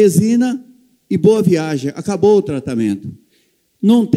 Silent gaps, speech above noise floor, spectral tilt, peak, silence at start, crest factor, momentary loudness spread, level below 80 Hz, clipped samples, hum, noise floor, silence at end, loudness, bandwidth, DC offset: none; 46 dB; -7 dB/octave; 0 dBFS; 0 s; 14 dB; 10 LU; -56 dBFS; under 0.1%; none; -59 dBFS; 0 s; -15 LUFS; 15 kHz; under 0.1%